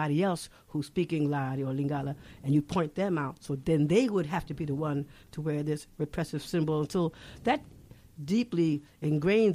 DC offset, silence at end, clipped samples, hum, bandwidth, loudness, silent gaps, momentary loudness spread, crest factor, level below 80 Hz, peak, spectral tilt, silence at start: under 0.1%; 0 s; under 0.1%; none; 14.5 kHz; -31 LUFS; none; 10 LU; 16 dB; -56 dBFS; -12 dBFS; -7 dB/octave; 0 s